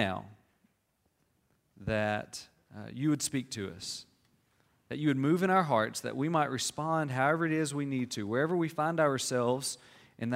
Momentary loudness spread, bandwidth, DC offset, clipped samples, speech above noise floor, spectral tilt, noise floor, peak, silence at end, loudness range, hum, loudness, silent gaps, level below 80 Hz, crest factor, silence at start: 15 LU; 16 kHz; under 0.1%; under 0.1%; 45 dB; -5 dB/octave; -76 dBFS; -12 dBFS; 0 s; 6 LU; none; -31 LUFS; none; -66 dBFS; 20 dB; 0 s